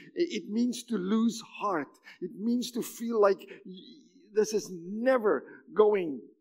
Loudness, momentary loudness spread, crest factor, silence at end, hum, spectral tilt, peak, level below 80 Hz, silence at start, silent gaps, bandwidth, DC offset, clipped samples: -30 LUFS; 16 LU; 20 dB; 0.15 s; none; -5 dB/octave; -10 dBFS; -88 dBFS; 0 s; none; 16 kHz; under 0.1%; under 0.1%